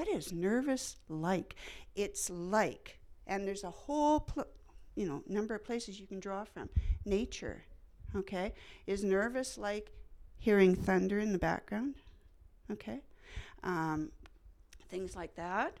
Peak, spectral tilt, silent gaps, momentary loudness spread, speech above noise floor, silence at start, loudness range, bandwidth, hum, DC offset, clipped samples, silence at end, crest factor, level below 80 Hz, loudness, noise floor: -14 dBFS; -5.5 dB/octave; none; 16 LU; 25 dB; 0 s; 7 LU; 15 kHz; none; under 0.1%; under 0.1%; 0 s; 22 dB; -48 dBFS; -36 LUFS; -60 dBFS